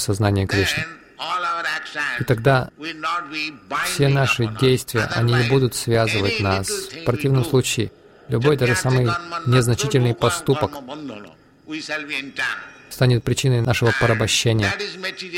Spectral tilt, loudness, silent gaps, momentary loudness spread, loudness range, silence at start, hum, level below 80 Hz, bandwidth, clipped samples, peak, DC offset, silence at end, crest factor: -5 dB/octave; -20 LUFS; none; 10 LU; 4 LU; 0 s; none; -46 dBFS; 16.5 kHz; under 0.1%; -4 dBFS; under 0.1%; 0 s; 16 dB